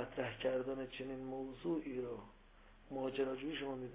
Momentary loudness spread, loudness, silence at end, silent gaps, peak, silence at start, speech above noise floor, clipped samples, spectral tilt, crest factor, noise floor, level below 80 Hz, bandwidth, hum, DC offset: 8 LU; -43 LUFS; 0 s; none; -26 dBFS; 0 s; 21 dB; under 0.1%; -4.5 dB/octave; 18 dB; -62 dBFS; -64 dBFS; 4 kHz; none; under 0.1%